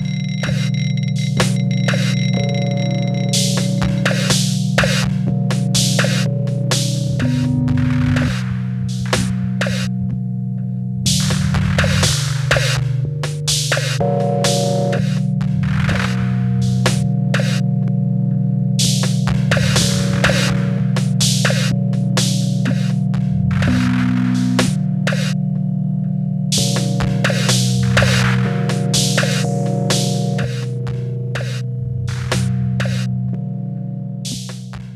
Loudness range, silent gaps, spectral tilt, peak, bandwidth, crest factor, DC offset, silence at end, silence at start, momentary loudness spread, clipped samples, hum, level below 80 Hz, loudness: 4 LU; none; -5 dB/octave; -2 dBFS; 14 kHz; 14 dB; under 0.1%; 0 s; 0 s; 7 LU; under 0.1%; none; -38 dBFS; -17 LUFS